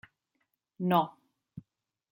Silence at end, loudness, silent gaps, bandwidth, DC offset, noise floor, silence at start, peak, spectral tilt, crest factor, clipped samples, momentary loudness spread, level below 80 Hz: 0.5 s; -30 LUFS; none; 16.5 kHz; under 0.1%; -80 dBFS; 0.8 s; -12 dBFS; -8.5 dB/octave; 24 dB; under 0.1%; 24 LU; -74 dBFS